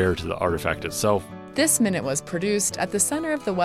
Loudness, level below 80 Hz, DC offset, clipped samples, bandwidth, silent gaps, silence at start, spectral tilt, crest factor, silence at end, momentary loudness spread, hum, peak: -23 LUFS; -48 dBFS; under 0.1%; under 0.1%; 16 kHz; none; 0 s; -3.5 dB/octave; 16 dB; 0 s; 6 LU; none; -8 dBFS